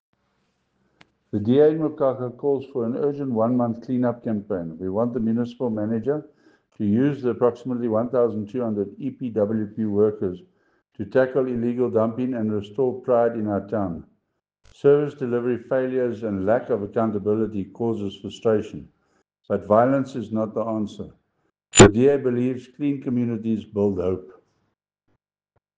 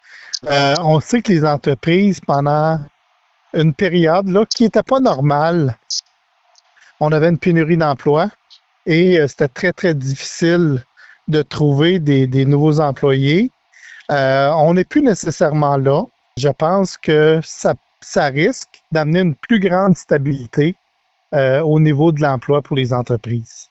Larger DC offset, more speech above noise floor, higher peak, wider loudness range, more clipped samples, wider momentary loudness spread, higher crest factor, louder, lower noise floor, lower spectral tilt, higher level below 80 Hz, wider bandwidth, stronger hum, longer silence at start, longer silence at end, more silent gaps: neither; about the same, 52 dB vs 49 dB; about the same, -2 dBFS vs -2 dBFS; first, 5 LU vs 2 LU; neither; about the same, 10 LU vs 8 LU; first, 20 dB vs 12 dB; second, -23 LUFS vs -15 LUFS; first, -74 dBFS vs -64 dBFS; about the same, -5.5 dB/octave vs -6.5 dB/octave; about the same, -50 dBFS vs -50 dBFS; first, 9.6 kHz vs 8.2 kHz; neither; first, 1.35 s vs 0.15 s; first, 1.45 s vs 0.05 s; neither